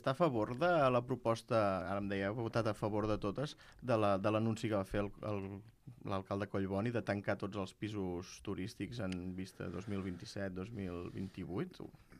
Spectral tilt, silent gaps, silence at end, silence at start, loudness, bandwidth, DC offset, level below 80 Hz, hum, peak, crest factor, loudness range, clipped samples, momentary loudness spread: -7 dB/octave; none; 0 s; 0 s; -38 LUFS; 14.5 kHz; under 0.1%; -62 dBFS; none; -20 dBFS; 18 dB; 8 LU; under 0.1%; 12 LU